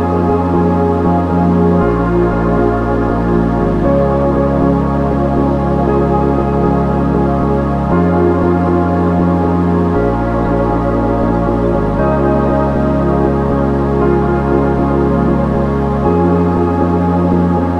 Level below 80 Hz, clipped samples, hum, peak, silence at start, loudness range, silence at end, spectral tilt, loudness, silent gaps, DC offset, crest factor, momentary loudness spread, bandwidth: -22 dBFS; under 0.1%; none; 0 dBFS; 0 s; 1 LU; 0 s; -10 dB/octave; -13 LUFS; none; 0.2%; 12 dB; 2 LU; 6.2 kHz